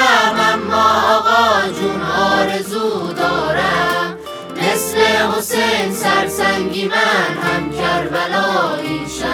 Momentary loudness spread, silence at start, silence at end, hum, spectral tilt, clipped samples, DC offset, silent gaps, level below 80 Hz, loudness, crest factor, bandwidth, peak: 7 LU; 0 s; 0 s; none; -3.5 dB/octave; under 0.1%; under 0.1%; none; -48 dBFS; -15 LUFS; 16 dB; over 20 kHz; 0 dBFS